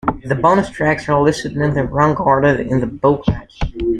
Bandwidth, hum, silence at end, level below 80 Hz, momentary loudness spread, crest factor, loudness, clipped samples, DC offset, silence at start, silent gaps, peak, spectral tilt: 10.5 kHz; none; 0 s; -32 dBFS; 7 LU; 14 dB; -16 LUFS; under 0.1%; under 0.1%; 0.05 s; none; -2 dBFS; -7 dB/octave